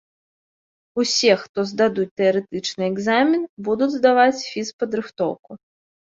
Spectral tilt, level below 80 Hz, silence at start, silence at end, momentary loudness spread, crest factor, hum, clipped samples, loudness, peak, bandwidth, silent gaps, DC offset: -4 dB/octave; -64 dBFS; 0.95 s; 0.45 s; 10 LU; 18 dB; none; under 0.1%; -20 LUFS; -2 dBFS; 7.8 kHz; 1.49-1.54 s, 2.11-2.17 s, 3.49-3.57 s, 4.73-4.79 s, 5.39-5.43 s; under 0.1%